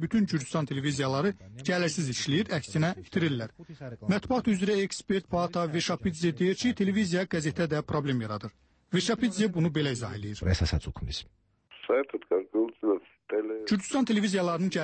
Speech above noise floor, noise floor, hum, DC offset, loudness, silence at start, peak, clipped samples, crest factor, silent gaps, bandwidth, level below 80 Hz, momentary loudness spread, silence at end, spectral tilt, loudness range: 23 dB; -51 dBFS; none; under 0.1%; -29 LUFS; 0 s; -14 dBFS; under 0.1%; 14 dB; none; 8.8 kHz; -48 dBFS; 9 LU; 0 s; -5.5 dB/octave; 2 LU